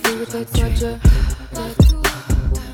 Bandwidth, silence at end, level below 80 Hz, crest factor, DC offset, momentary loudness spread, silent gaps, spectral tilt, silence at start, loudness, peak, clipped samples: 18.5 kHz; 0 s; -18 dBFS; 14 dB; under 0.1%; 10 LU; none; -5.5 dB/octave; 0 s; -19 LUFS; -2 dBFS; under 0.1%